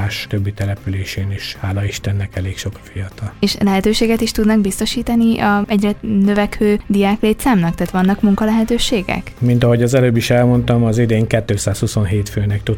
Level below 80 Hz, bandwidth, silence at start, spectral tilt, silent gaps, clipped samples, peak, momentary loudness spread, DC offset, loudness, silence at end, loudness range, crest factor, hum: -34 dBFS; 17 kHz; 0 s; -6 dB/octave; none; under 0.1%; 0 dBFS; 9 LU; under 0.1%; -16 LUFS; 0 s; 5 LU; 16 dB; none